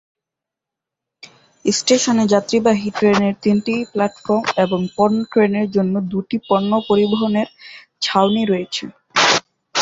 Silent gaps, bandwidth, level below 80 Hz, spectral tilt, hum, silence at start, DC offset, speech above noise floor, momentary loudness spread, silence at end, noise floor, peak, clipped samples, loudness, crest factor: none; 8 kHz; -58 dBFS; -4.5 dB/octave; none; 1.65 s; under 0.1%; 68 dB; 7 LU; 0 s; -85 dBFS; 0 dBFS; under 0.1%; -17 LUFS; 16 dB